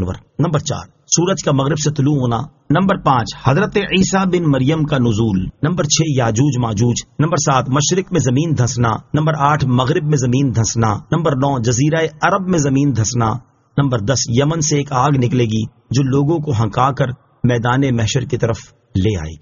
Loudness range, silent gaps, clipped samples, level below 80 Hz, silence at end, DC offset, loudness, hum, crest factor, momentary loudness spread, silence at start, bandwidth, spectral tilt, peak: 1 LU; none; under 0.1%; -40 dBFS; 0.05 s; under 0.1%; -16 LUFS; none; 16 dB; 5 LU; 0 s; 7.4 kHz; -6 dB/octave; 0 dBFS